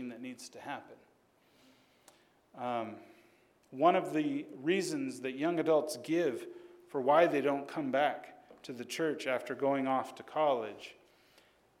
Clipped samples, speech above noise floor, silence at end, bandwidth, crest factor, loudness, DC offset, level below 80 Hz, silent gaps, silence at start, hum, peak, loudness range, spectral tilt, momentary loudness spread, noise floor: under 0.1%; 35 dB; 0.85 s; 16 kHz; 22 dB; -33 LUFS; under 0.1%; -86 dBFS; none; 0 s; none; -14 dBFS; 8 LU; -5 dB/octave; 18 LU; -68 dBFS